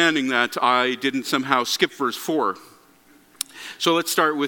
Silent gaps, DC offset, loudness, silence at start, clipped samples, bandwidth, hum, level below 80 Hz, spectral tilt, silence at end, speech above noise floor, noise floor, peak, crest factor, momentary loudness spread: none; under 0.1%; -22 LUFS; 0 s; under 0.1%; 17.5 kHz; 60 Hz at -65 dBFS; -72 dBFS; -2.5 dB/octave; 0 s; 32 dB; -54 dBFS; 0 dBFS; 22 dB; 12 LU